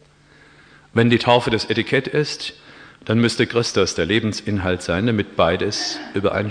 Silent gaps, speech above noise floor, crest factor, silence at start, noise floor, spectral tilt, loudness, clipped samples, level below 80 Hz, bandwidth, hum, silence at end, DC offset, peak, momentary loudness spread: none; 31 dB; 18 dB; 0.95 s; -51 dBFS; -5 dB/octave; -19 LUFS; under 0.1%; -48 dBFS; 10.5 kHz; none; 0 s; under 0.1%; -2 dBFS; 7 LU